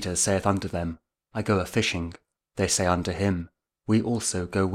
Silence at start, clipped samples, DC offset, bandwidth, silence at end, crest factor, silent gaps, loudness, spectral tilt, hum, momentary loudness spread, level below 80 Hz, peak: 0 s; under 0.1%; under 0.1%; 16 kHz; 0 s; 20 dB; none; -26 LUFS; -4.5 dB/octave; none; 14 LU; -48 dBFS; -8 dBFS